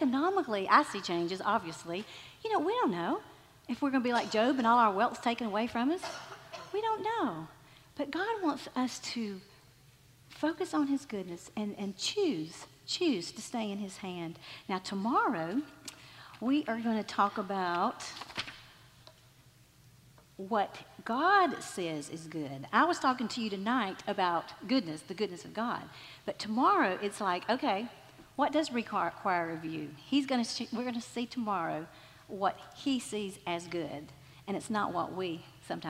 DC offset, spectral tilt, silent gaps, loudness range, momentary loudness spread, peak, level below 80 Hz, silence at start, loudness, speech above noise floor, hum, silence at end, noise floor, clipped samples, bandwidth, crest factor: under 0.1%; -4.5 dB/octave; none; 6 LU; 14 LU; -10 dBFS; -72 dBFS; 0 s; -33 LUFS; 28 dB; none; 0 s; -61 dBFS; under 0.1%; 16 kHz; 24 dB